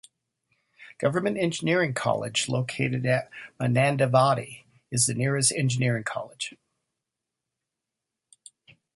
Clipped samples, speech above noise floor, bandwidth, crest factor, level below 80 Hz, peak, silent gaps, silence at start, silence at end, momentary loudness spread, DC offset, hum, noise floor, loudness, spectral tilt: under 0.1%; 61 dB; 12 kHz; 20 dB; -64 dBFS; -8 dBFS; none; 0.8 s; 2.45 s; 11 LU; under 0.1%; none; -86 dBFS; -25 LUFS; -4.5 dB/octave